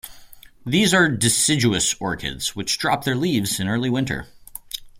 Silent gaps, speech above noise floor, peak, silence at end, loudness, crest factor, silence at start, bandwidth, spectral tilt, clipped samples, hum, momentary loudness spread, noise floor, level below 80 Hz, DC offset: none; 24 dB; -2 dBFS; 0 s; -20 LUFS; 20 dB; 0.05 s; 16.5 kHz; -3.5 dB/octave; under 0.1%; none; 16 LU; -44 dBFS; -48 dBFS; under 0.1%